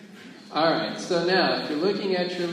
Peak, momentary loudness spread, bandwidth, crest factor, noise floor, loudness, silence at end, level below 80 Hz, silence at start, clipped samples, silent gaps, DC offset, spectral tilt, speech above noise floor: -10 dBFS; 9 LU; 12.5 kHz; 16 dB; -45 dBFS; -24 LUFS; 0 s; -72 dBFS; 0 s; under 0.1%; none; under 0.1%; -5 dB/octave; 21 dB